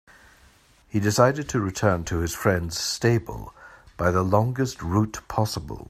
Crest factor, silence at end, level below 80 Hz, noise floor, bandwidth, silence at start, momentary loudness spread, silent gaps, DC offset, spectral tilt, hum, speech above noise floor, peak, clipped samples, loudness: 20 dB; 0.05 s; -46 dBFS; -56 dBFS; 15.5 kHz; 0.95 s; 7 LU; none; under 0.1%; -5.5 dB/octave; none; 33 dB; -4 dBFS; under 0.1%; -24 LUFS